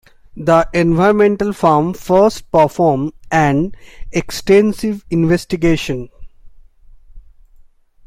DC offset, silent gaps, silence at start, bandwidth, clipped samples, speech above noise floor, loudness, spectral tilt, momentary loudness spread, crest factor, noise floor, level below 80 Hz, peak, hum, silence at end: under 0.1%; none; 0.35 s; 16 kHz; under 0.1%; 32 dB; -15 LUFS; -6.5 dB/octave; 10 LU; 14 dB; -45 dBFS; -36 dBFS; 0 dBFS; none; 0.9 s